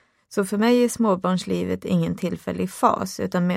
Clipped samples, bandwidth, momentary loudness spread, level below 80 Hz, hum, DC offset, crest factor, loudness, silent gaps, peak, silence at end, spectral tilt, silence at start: under 0.1%; 16 kHz; 9 LU; -56 dBFS; none; under 0.1%; 18 dB; -23 LUFS; none; -4 dBFS; 0 s; -6 dB/octave; 0.3 s